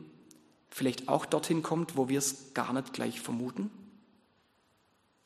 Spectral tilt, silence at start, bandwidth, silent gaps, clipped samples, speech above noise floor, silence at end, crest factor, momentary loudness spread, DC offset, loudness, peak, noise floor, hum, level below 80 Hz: -4.5 dB/octave; 0 s; 13 kHz; none; under 0.1%; 38 dB; 1.35 s; 22 dB; 9 LU; under 0.1%; -33 LUFS; -12 dBFS; -71 dBFS; none; -78 dBFS